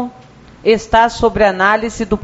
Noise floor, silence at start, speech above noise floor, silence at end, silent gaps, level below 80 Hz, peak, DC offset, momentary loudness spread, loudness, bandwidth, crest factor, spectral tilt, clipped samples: -40 dBFS; 0 s; 27 dB; 0 s; none; -34 dBFS; 0 dBFS; under 0.1%; 8 LU; -13 LUFS; 8 kHz; 14 dB; -3 dB/octave; under 0.1%